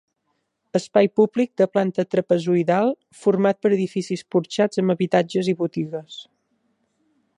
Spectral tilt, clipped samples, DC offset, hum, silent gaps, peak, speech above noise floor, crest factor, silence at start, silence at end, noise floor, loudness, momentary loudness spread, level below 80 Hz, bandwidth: -6.5 dB/octave; under 0.1%; under 0.1%; none; none; -4 dBFS; 53 dB; 18 dB; 0.75 s; 1.15 s; -73 dBFS; -21 LUFS; 8 LU; -70 dBFS; 11 kHz